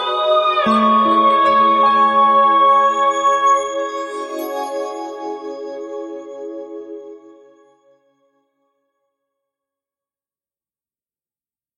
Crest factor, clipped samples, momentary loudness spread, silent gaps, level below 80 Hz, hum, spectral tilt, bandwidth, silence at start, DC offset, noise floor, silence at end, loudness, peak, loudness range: 14 dB; under 0.1%; 19 LU; none; -64 dBFS; none; -3.5 dB/octave; 12 kHz; 0 s; under 0.1%; under -90 dBFS; 4.6 s; -14 LUFS; -4 dBFS; 21 LU